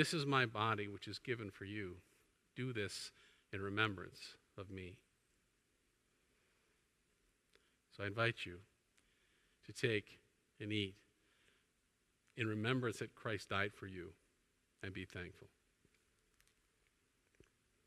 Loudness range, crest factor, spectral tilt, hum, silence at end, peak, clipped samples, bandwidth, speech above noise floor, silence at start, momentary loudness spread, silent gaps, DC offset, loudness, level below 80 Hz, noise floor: 12 LU; 26 dB; -5 dB/octave; none; 2.4 s; -18 dBFS; under 0.1%; 14 kHz; 38 dB; 0 s; 16 LU; none; under 0.1%; -42 LUFS; -78 dBFS; -81 dBFS